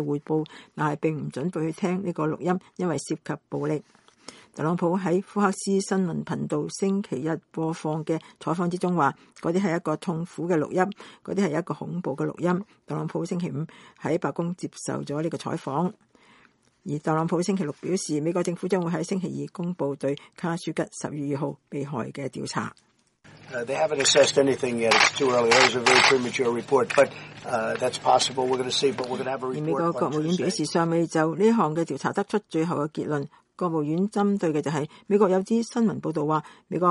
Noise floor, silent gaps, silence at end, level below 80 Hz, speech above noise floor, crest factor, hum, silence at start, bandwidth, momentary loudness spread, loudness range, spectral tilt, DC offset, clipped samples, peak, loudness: -60 dBFS; none; 0 s; -68 dBFS; 35 dB; 20 dB; none; 0 s; 11.5 kHz; 11 LU; 10 LU; -4.5 dB/octave; under 0.1%; under 0.1%; -6 dBFS; -25 LUFS